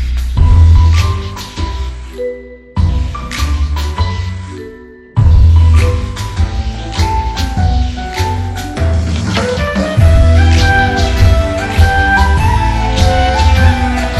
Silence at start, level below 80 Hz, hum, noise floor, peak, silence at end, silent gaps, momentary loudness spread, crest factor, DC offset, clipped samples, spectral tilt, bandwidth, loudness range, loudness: 0 s; -16 dBFS; none; -33 dBFS; 0 dBFS; 0 s; none; 13 LU; 10 dB; under 0.1%; 0.5%; -6 dB/octave; 12 kHz; 8 LU; -12 LUFS